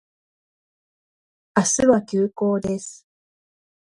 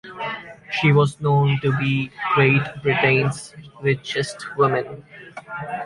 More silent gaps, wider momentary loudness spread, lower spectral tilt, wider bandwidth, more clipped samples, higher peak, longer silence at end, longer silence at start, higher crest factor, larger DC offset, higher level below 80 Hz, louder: neither; second, 11 LU vs 17 LU; second, -4.5 dB/octave vs -6.5 dB/octave; about the same, 11.5 kHz vs 11.5 kHz; neither; about the same, -2 dBFS vs -4 dBFS; first, 0.95 s vs 0 s; first, 1.55 s vs 0.05 s; about the same, 22 dB vs 18 dB; neither; about the same, -56 dBFS vs -56 dBFS; about the same, -21 LUFS vs -20 LUFS